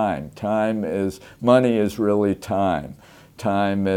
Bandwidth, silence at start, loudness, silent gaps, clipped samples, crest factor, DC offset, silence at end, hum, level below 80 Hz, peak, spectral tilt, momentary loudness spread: 16.5 kHz; 0 s; -22 LUFS; none; under 0.1%; 18 dB; under 0.1%; 0 s; none; -52 dBFS; -2 dBFS; -7 dB/octave; 11 LU